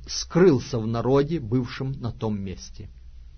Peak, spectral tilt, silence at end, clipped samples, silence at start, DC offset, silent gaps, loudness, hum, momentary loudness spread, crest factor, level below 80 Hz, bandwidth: -6 dBFS; -6.5 dB/octave; 0 s; under 0.1%; 0 s; under 0.1%; none; -24 LUFS; none; 20 LU; 18 dB; -44 dBFS; 6.6 kHz